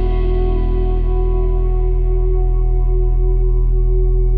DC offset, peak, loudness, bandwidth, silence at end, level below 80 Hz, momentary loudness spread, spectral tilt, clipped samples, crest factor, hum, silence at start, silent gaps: under 0.1%; -6 dBFS; -19 LUFS; 3.2 kHz; 0 s; -14 dBFS; 1 LU; -11.5 dB/octave; under 0.1%; 8 dB; none; 0 s; none